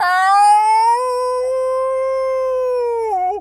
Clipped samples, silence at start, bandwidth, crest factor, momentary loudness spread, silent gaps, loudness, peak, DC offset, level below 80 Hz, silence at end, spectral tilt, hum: under 0.1%; 0 s; 14 kHz; 12 dB; 8 LU; none; -16 LUFS; -4 dBFS; under 0.1%; -54 dBFS; 0 s; -1 dB/octave; none